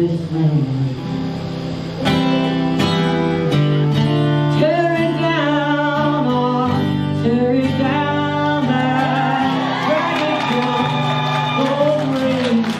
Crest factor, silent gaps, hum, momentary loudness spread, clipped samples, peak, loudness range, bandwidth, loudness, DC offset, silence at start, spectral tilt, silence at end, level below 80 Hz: 14 dB; none; none; 3 LU; under 0.1%; -4 dBFS; 2 LU; 10.5 kHz; -17 LUFS; under 0.1%; 0 s; -7 dB/octave; 0 s; -48 dBFS